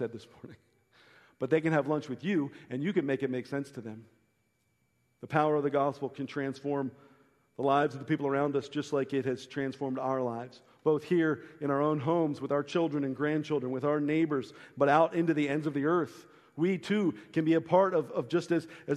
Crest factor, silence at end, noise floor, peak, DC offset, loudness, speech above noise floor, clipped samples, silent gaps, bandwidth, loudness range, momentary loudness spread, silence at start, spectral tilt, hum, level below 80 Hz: 22 dB; 0 s; -75 dBFS; -10 dBFS; under 0.1%; -31 LUFS; 44 dB; under 0.1%; none; 11 kHz; 4 LU; 10 LU; 0 s; -7.5 dB/octave; none; -76 dBFS